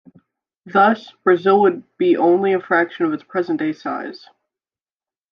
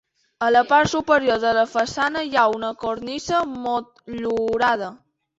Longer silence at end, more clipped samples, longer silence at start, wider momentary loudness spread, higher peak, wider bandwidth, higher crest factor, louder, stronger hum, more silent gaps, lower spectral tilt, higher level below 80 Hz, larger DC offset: first, 1.15 s vs 0.45 s; neither; first, 0.65 s vs 0.4 s; about the same, 10 LU vs 10 LU; about the same, -2 dBFS vs -4 dBFS; second, 6 kHz vs 8 kHz; about the same, 16 dB vs 18 dB; first, -18 LUFS vs -21 LUFS; neither; neither; first, -8 dB/octave vs -4 dB/octave; second, -74 dBFS vs -54 dBFS; neither